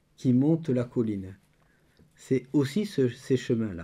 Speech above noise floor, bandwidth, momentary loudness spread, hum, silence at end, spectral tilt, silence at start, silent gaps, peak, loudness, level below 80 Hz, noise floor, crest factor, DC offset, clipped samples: 38 dB; 13 kHz; 7 LU; none; 0 s; -7.5 dB/octave; 0.2 s; none; -14 dBFS; -27 LUFS; -68 dBFS; -64 dBFS; 14 dB; under 0.1%; under 0.1%